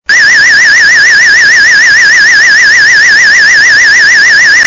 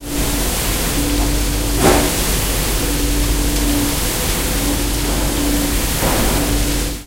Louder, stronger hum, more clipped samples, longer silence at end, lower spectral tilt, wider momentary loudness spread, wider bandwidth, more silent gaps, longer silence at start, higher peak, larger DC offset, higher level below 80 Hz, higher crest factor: first, -1 LUFS vs -17 LUFS; neither; first, 0.2% vs under 0.1%; about the same, 0 s vs 0 s; second, 1.5 dB/octave vs -3.5 dB/octave; second, 0 LU vs 3 LU; second, 7.8 kHz vs 16 kHz; neither; about the same, 0.1 s vs 0 s; about the same, 0 dBFS vs 0 dBFS; first, 0.1% vs under 0.1%; second, -42 dBFS vs -20 dBFS; second, 4 dB vs 16 dB